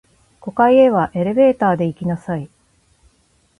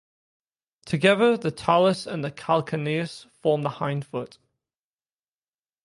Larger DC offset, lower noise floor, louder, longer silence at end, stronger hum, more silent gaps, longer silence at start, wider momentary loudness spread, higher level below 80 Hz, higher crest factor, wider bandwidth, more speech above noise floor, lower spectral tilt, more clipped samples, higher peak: neither; second, -59 dBFS vs under -90 dBFS; first, -16 LUFS vs -24 LUFS; second, 1.15 s vs 1.6 s; neither; neither; second, 0.45 s vs 0.85 s; about the same, 15 LU vs 13 LU; first, -52 dBFS vs -64 dBFS; second, 16 dB vs 22 dB; about the same, 10.5 kHz vs 11.5 kHz; second, 44 dB vs over 66 dB; first, -8.5 dB/octave vs -6 dB/octave; neither; about the same, -2 dBFS vs -4 dBFS